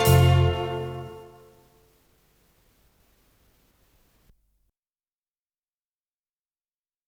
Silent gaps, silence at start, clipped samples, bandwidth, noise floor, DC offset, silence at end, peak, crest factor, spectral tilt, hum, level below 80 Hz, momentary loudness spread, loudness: none; 0 s; under 0.1%; 18.5 kHz; under -90 dBFS; under 0.1%; 5.85 s; -6 dBFS; 22 dB; -6 dB/octave; none; -48 dBFS; 24 LU; -23 LUFS